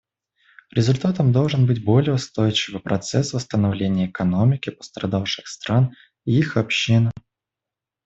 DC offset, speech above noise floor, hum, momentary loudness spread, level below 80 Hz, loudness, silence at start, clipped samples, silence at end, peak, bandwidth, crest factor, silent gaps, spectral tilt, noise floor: under 0.1%; 67 dB; none; 8 LU; -54 dBFS; -21 LUFS; 0.75 s; under 0.1%; 0.85 s; -4 dBFS; 8 kHz; 16 dB; none; -6 dB/octave; -87 dBFS